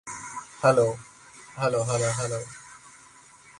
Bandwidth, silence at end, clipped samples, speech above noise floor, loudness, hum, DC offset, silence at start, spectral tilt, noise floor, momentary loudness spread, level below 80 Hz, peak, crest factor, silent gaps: 11.5 kHz; 0.7 s; under 0.1%; 28 dB; -26 LUFS; none; under 0.1%; 0.05 s; -4.5 dB/octave; -52 dBFS; 25 LU; -60 dBFS; -6 dBFS; 22 dB; none